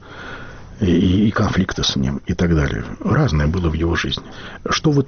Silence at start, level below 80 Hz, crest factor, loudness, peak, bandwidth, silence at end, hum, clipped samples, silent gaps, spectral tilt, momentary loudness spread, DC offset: 0 s; -30 dBFS; 12 dB; -19 LUFS; -6 dBFS; 6.8 kHz; 0 s; none; under 0.1%; none; -5.5 dB/octave; 17 LU; under 0.1%